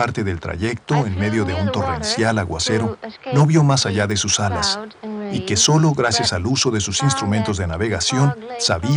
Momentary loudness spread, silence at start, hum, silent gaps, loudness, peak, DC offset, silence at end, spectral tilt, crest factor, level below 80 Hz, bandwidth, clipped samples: 9 LU; 0 s; none; none; -19 LUFS; -2 dBFS; under 0.1%; 0 s; -4 dB/octave; 16 dB; -46 dBFS; 10.5 kHz; under 0.1%